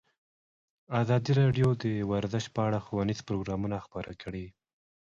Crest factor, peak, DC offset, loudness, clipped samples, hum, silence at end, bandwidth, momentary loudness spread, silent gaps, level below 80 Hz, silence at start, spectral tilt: 16 dB; -14 dBFS; under 0.1%; -30 LUFS; under 0.1%; none; 0.65 s; 7.6 kHz; 15 LU; none; -54 dBFS; 0.9 s; -7.5 dB/octave